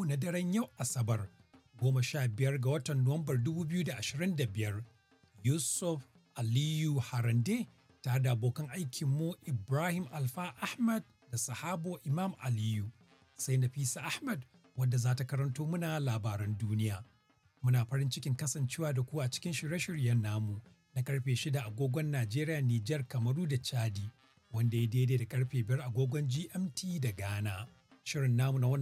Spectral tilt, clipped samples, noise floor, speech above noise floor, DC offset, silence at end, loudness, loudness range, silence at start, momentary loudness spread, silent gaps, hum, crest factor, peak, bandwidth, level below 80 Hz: -5.5 dB/octave; under 0.1%; -70 dBFS; 37 dB; under 0.1%; 0 s; -35 LUFS; 2 LU; 0 s; 8 LU; none; none; 16 dB; -18 dBFS; 15.5 kHz; -74 dBFS